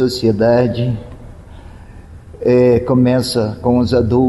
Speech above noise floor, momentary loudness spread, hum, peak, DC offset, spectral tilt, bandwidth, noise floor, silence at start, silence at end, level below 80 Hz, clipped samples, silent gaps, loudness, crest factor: 23 dB; 9 LU; none; -4 dBFS; under 0.1%; -7 dB/octave; 12.5 kHz; -36 dBFS; 0 s; 0 s; -38 dBFS; under 0.1%; none; -14 LUFS; 12 dB